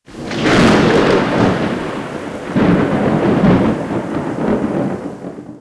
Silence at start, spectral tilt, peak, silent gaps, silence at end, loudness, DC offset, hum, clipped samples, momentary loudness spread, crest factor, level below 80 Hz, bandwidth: 0.1 s; -6.5 dB/octave; 0 dBFS; none; 0 s; -15 LUFS; under 0.1%; none; under 0.1%; 14 LU; 14 dB; -36 dBFS; 11 kHz